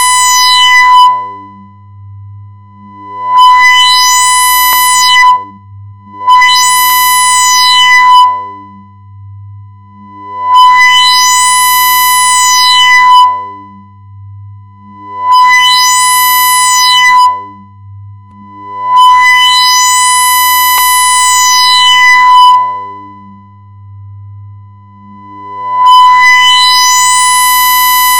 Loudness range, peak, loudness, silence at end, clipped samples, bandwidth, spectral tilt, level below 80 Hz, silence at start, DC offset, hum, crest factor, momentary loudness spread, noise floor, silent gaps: 4 LU; 0 dBFS; -4 LUFS; 0 s; 4%; over 20 kHz; 2 dB/octave; -52 dBFS; 0 s; under 0.1%; none; 8 dB; 13 LU; -33 dBFS; none